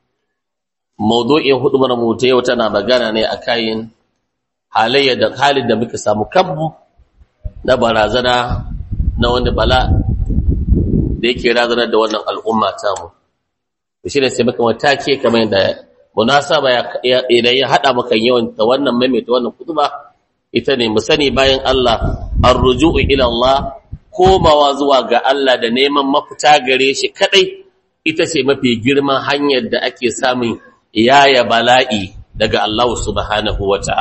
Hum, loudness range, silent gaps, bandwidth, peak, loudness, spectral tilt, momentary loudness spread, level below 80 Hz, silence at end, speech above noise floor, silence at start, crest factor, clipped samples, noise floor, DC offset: none; 4 LU; none; 8.6 kHz; 0 dBFS; -13 LUFS; -5 dB/octave; 9 LU; -26 dBFS; 0 s; 68 dB; 1 s; 14 dB; under 0.1%; -81 dBFS; under 0.1%